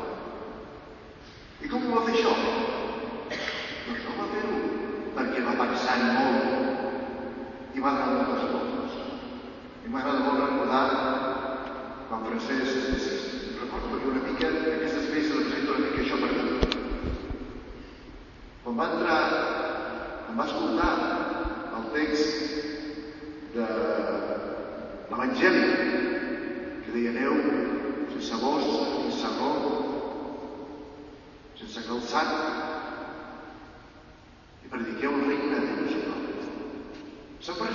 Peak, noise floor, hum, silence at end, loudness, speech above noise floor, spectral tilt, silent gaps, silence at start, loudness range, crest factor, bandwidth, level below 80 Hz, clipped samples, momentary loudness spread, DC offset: -6 dBFS; -51 dBFS; none; 0 s; -28 LUFS; 25 dB; -5 dB/octave; none; 0 s; 5 LU; 24 dB; 7.2 kHz; -48 dBFS; under 0.1%; 17 LU; under 0.1%